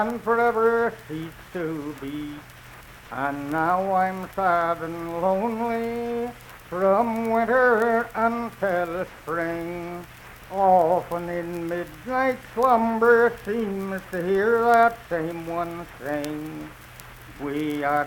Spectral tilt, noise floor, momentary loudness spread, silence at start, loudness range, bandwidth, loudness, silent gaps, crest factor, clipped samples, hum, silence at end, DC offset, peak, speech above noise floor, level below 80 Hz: -6.5 dB/octave; -45 dBFS; 17 LU; 0 s; 5 LU; 19 kHz; -24 LUFS; none; 18 dB; under 0.1%; none; 0 s; under 0.1%; -6 dBFS; 21 dB; -52 dBFS